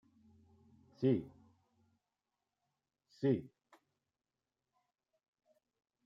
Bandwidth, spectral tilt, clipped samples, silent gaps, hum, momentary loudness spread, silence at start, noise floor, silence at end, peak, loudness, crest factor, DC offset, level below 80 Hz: 7.2 kHz; -9.5 dB/octave; under 0.1%; none; none; 4 LU; 1 s; under -90 dBFS; 2.6 s; -20 dBFS; -37 LUFS; 24 dB; under 0.1%; -80 dBFS